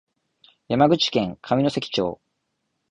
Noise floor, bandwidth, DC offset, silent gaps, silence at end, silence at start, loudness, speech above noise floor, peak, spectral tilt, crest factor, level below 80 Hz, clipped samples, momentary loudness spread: -76 dBFS; 10 kHz; under 0.1%; none; 0.75 s; 0.7 s; -22 LUFS; 54 dB; -6 dBFS; -5.5 dB/octave; 18 dB; -56 dBFS; under 0.1%; 10 LU